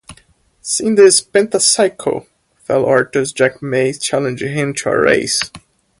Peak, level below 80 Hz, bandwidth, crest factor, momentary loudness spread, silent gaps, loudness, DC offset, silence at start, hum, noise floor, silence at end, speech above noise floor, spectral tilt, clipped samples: 0 dBFS; -52 dBFS; 11.5 kHz; 16 dB; 12 LU; none; -14 LUFS; under 0.1%; 0.1 s; none; -52 dBFS; 0.4 s; 38 dB; -3 dB/octave; under 0.1%